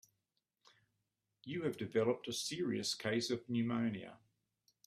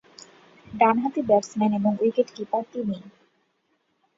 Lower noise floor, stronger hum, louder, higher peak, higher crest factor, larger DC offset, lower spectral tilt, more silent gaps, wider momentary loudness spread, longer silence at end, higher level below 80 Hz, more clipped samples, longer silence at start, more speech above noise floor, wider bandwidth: first, -87 dBFS vs -71 dBFS; neither; second, -38 LUFS vs -24 LUFS; second, -22 dBFS vs -6 dBFS; about the same, 18 dB vs 20 dB; neither; second, -4.5 dB/octave vs -6.5 dB/octave; neither; about the same, 10 LU vs 10 LU; second, 0.7 s vs 1.1 s; second, -78 dBFS vs -66 dBFS; neither; first, 1.45 s vs 0.7 s; about the same, 49 dB vs 48 dB; first, 15 kHz vs 7.8 kHz